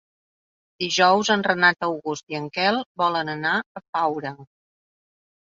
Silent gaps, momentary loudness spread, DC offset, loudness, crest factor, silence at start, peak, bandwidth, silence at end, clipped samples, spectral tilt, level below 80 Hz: 2.23-2.27 s, 2.86-2.95 s, 3.66-3.75 s, 3.89-3.93 s; 12 LU; under 0.1%; -22 LUFS; 20 dB; 0.8 s; -4 dBFS; 7.8 kHz; 1.15 s; under 0.1%; -3.5 dB/octave; -70 dBFS